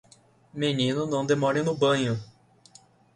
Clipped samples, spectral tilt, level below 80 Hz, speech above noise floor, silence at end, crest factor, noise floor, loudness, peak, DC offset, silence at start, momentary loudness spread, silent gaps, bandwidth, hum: under 0.1%; -5.5 dB/octave; -64 dBFS; 33 dB; 0.9 s; 18 dB; -58 dBFS; -26 LUFS; -10 dBFS; under 0.1%; 0.55 s; 7 LU; none; 10.5 kHz; none